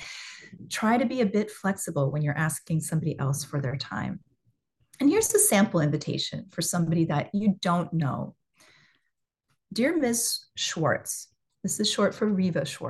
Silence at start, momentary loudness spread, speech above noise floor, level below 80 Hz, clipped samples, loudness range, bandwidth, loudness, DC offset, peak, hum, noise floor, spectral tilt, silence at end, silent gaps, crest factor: 0 s; 12 LU; 53 dB; -64 dBFS; under 0.1%; 5 LU; 12.5 kHz; -26 LUFS; under 0.1%; -8 dBFS; none; -79 dBFS; -4.5 dB/octave; 0 s; none; 20 dB